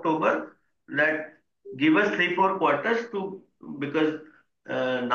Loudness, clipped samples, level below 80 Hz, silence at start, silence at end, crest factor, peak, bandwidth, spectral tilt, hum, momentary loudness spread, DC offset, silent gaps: -25 LUFS; under 0.1%; -78 dBFS; 0 s; 0 s; 16 dB; -10 dBFS; 7 kHz; -6 dB/octave; none; 20 LU; under 0.1%; none